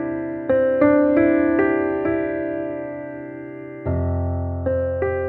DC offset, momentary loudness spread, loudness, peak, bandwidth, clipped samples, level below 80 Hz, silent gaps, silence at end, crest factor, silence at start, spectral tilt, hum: under 0.1%; 16 LU; -21 LUFS; -4 dBFS; 4 kHz; under 0.1%; -40 dBFS; none; 0 s; 16 dB; 0 s; -12 dB/octave; none